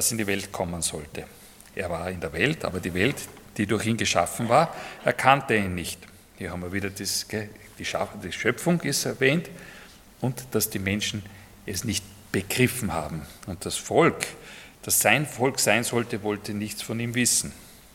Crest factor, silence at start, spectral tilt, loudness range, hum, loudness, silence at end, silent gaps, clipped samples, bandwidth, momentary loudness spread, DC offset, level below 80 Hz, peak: 26 dB; 0 s; -3.5 dB/octave; 5 LU; none; -25 LUFS; 0.2 s; none; under 0.1%; 17.5 kHz; 17 LU; under 0.1%; -56 dBFS; -2 dBFS